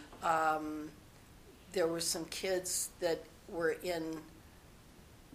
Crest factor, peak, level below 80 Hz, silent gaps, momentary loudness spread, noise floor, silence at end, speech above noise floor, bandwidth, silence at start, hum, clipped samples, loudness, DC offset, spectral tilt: 20 dB; -18 dBFS; -64 dBFS; none; 13 LU; -58 dBFS; 0 s; 22 dB; 15.5 kHz; 0 s; none; under 0.1%; -36 LUFS; under 0.1%; -2.5 dB/octave